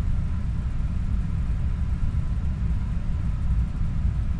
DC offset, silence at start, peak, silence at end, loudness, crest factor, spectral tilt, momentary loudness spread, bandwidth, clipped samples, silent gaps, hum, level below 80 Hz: under 0.1%; 0 s; -14 dBFS; 0 s; -28 LUFS; 10 dB; -8.5 dB/octave; 2 LU; 7.4 kHz; under 0.1%; none; none; -26 dBFS